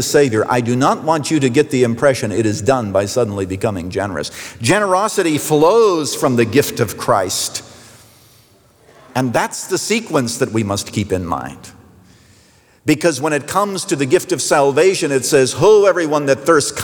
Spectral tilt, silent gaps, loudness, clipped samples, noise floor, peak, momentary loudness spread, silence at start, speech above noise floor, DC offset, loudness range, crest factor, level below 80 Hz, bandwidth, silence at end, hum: -4.5 dB/octave; none; -16 LUFS; under 0.1%; -50 dBFS; -2 dBFS; 9 LU; 0 s; 35 dB; under 0.1%; 7 LU; 14 dB; -54 dBFS; over 20 kHz; 0 s; none